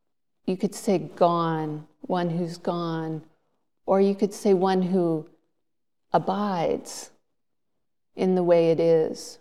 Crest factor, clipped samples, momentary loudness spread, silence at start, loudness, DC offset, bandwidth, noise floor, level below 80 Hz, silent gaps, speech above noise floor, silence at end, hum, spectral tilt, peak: 20 dB; under 0.1%; 13 LU; 0.45 s; -25 LUFS; 0.2%; 14 kHz; -84 dBFS; -70 dBFS; none; 61 dB; 0.05 s; none; -6.5 dB/octave; -6 dBFS